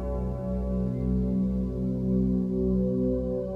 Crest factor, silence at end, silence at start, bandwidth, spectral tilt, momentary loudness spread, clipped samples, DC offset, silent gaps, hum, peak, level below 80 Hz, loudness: 10 dB; 0 s; 0 s; 2.4 kHz; -12 dB/octave; 5 LU; under 0.1%; under 0.1%; none; none; -16 dBFS; -36 dBFS; -28 LUFS